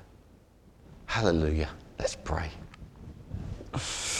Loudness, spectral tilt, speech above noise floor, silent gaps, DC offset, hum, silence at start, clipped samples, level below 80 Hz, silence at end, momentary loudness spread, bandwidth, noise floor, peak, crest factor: -32 LUFS; -4.5 dB/octave; 28 dB; none; under 0.1%; none; 0 s; under 0.1%; -42 dBFS; 0 s; 22 LU; 13 kHz; -57 dBFS; -10 dBFS; 24 dB